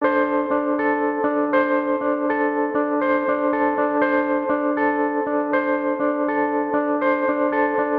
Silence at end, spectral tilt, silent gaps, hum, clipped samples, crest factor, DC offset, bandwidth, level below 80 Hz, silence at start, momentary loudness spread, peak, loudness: 0 s; -8.5 dB/octave; none; none; under 0.1%; 14 dB; under 0.1%; 4.6 kHz; -60 dBFS; 0 s; 2 LU; -8 dBFS; -21 LUFS